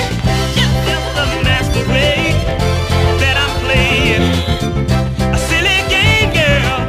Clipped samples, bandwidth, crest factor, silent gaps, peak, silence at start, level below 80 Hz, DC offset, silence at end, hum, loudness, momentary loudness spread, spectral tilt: under 0.1%; 16 kHz; 12 dB; none; 0 dBFS; 0 s; -22 dBFS; 0.2%; 0 s; none; -13 LUFS; 5 LU; -4.5 dB/octave